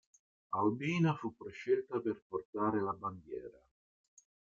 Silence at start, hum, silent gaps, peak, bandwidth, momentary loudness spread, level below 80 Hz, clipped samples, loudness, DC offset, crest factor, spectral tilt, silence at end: 0.5 s; none; 2.22-2.30 s, 2.45-2.53 s; -20 dBFS; 7.4 kHz; 13 LU; -74 dBFS; under 0.1%; -37 LUFS; under 0.1%; 18 dB; -7.5 dB/octave; 1.05 s